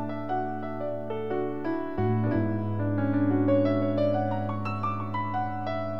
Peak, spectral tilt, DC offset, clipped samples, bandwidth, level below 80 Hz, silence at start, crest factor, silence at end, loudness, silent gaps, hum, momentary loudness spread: -12 dBFS; -10 dB/octave; 1%; under 0.1%; 5.8 kHz; -58 dBFS; 0 s; 14 dB; 0 s; -28 LUFS; none; none; 8 LU